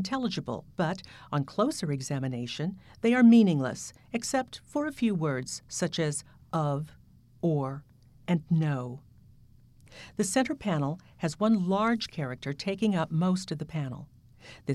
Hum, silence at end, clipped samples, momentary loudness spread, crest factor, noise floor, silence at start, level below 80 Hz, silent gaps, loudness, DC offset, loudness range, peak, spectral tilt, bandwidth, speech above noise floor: none; 0 s; under 0.1%; 12 LU; 18 dB; -56 dBFS; 0 s; -62 dBFS; none; -29 LUFS; under 0.1%; 6 LU; -12 dBFS; -6 dB/octave; 13 kHz; 28 dB